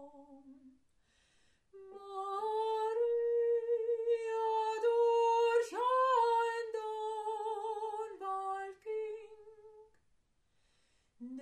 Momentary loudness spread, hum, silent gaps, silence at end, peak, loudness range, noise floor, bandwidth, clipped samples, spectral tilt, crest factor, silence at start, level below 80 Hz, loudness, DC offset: 13 LU; none; none; 0 s; -20 dBFS; 11 LU; -75 dBFS; 9.8 kHz; under 0.1%; -2 dB/octave; 16 dB; 0 s; -80 dBFS; -34 LUFS; under 0.1%